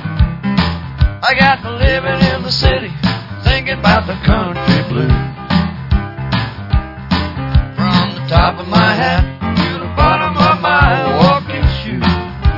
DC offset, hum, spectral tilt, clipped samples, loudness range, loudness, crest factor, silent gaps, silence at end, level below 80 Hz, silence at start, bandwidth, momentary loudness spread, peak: under 0.1%; none; -7 dB/octave; under 0.1%; 4 LU; -14 LUFS; 14 dB; none; 0 s; -22 dBFS; 0 s; 6 kHz; 7 LU; 0 dBFS